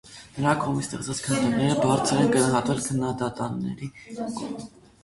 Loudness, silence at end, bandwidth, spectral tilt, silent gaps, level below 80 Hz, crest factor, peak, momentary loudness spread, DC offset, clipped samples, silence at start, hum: -25 LUFS; 0.35 s; 12 kHz; -5 dB/octave; none; -54 dBFS; 18 dB; -8 dBFS; 15 LU; under 0.1%; under 0.1%; 0.05 s; none